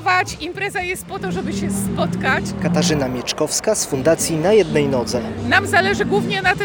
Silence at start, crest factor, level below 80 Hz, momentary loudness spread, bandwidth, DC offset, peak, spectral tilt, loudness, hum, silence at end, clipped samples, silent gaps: 0 s; 18 dB; -42 dBFS; 8 LU; over 20 kHz; under 0.1%; 0 dBFS; -4 dB/octave; -18 LUFS; none; 0 s; under 0.1%; none